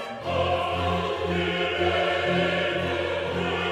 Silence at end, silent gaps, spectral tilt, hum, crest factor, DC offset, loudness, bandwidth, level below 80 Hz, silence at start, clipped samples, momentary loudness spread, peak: 0 s; none; -5.5 dB/octave; none; 14 dB; under 0.1%; -25 LUFS; 13 kHz; -48 dBFS; 0 s; under 0.1%; 3 LU; -10 dBFS